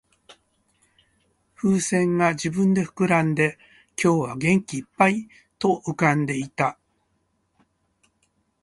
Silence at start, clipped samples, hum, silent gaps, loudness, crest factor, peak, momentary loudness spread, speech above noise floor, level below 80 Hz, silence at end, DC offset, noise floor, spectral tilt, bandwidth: 0.3 s; under 0.1%; none; none; -22 LUFS; 22 dB; -4 dBFS; 6 LU; 49 dB; -60 dBFS; 1.9 s; under 0.1%; -70 dBFS; -6 dB/octave; 11.5 kHz